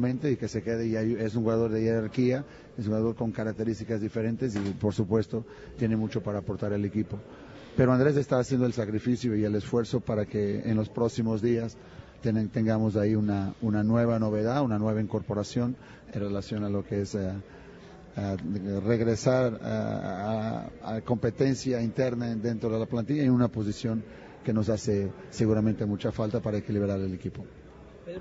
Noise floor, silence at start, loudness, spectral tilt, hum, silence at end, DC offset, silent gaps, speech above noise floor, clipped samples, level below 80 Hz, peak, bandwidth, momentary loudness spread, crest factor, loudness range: -48 dBFS; 0 s; -29 LUFS; -7.5 dB/octave; none; 0 s; under 0.1%; none; 20 dB; under 0.1%; -54 dBFS; -10 dBFS; 8 kHz; 10 LU; 20 dB; 3 LU